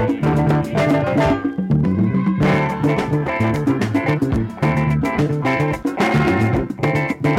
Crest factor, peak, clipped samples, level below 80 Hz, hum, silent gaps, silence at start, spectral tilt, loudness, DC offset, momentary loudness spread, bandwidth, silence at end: 12 dB; -6 dBFS; under 0.1%; -38 dBFS; none; none; 0 s; -8 dB/octave; -18 LUFS; under 0.1%; 3 LU; 13 kHz; 0 s